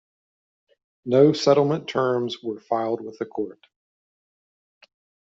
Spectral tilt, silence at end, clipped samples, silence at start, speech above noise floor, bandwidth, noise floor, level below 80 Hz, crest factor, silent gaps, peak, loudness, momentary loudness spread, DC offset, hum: -5.5 dB/octave; 1.85 s; under 0.1%; 1.05 s; over 68 dB; 7.8 kHz; under -90 dBFS; -70 dBFS; 20 dB; none; -4 dBFS; -22 LUFS; 15 LU; under 0.1%; none